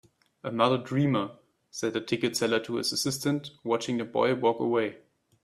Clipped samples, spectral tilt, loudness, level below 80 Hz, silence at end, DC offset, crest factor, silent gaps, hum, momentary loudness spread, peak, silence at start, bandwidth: under 0.1%; -4.5 dB/octave; -28 LUFS; -70 dBFS; 0.5 s; under 0.1%; 20 dB; none; none; 9 LU; -8 dBFS; 0.45 s; 15 kHz